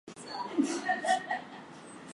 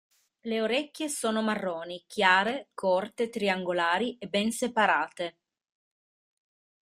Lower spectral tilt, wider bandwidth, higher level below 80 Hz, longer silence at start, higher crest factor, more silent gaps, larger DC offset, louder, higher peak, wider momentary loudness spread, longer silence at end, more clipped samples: about the same, -3 dB/octave vs -3.5 dB/octave; second, 11.5 kHz vs 15.5 kHz; about the same, -78 dBFS vs -74 dBFS; second, 0.05 s vs 0.45 s; about the same, 18 dB vs 22 dB; neither; neither; second, -32 LUFS vs -28 LUFS; second, -16 dBFS vs -6 dBFS; first, 18 LU vs 10 LU; second, 0 s vs 1.65 s; neither